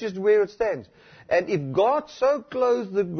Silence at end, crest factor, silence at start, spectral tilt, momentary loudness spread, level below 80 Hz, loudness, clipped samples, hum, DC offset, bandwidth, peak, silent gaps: 0 s; 14 dB; 0 s; -6.5 dB/octave; 5 LU; -60 dBFS; -23 LUFS; under 0.1%; none; under 0.1%; 6.4 kHz; -10 dBFS; none